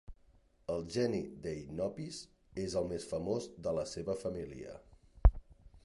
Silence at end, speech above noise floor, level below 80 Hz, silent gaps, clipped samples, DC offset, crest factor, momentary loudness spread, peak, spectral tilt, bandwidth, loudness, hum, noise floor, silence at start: 0.05 s; 28 dB; -40 dBFS; none; under 0.1%; under 0.1%; 26 dB; 16 LU; -12 dBFS; -6.5 dB/octave; 11.5 kHz; -38 LUFS; none; -66 dBFS; 0.1 s